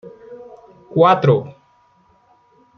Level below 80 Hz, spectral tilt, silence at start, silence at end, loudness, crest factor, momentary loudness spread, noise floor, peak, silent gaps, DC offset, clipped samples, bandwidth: -64 dBFS; -8.5 dB/octave; 0.05 s; 1.25 s; -15 LUFS; 18 dB; 26 LU; -56 dBFS; -2 dBFS; none; under 0.1%; under 0.1%; 6.4 kHz